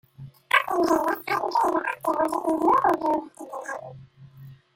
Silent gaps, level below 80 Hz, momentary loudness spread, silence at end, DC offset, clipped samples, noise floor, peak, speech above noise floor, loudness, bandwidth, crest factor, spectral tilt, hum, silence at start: none; -62 dBFS; 15 LU; 0.2 s; under 0.1%; under 0.1%; -47 dBFS; -4 dBFS; 23 dB; -24 LUFS; 16.5 kHz; 22 dB; -4.5 dB/octave; none; 0.2 s